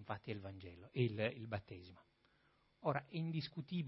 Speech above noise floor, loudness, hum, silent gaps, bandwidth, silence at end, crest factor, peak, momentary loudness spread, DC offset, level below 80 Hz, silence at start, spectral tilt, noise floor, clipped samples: 32 dB; -43 LUFS; none; none; 5.6 kHz; 0 s; 22 dB; -22 dBFS; 16 LU; under 0.1%; -76 dBFS; 0 s; -5.5 dB/octave; -76 dBFS; under 0.1%